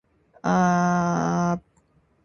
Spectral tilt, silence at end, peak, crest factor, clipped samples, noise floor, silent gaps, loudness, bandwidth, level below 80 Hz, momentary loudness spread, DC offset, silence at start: -7 dB/octave; 0.65 s; -8 dBFS; 16 dB; under 0.1%; -63 dBFS; none; -23 LUFS; 6.8 kHz; -54 dBFS; 9 LU; under 0.1%; 0.45 s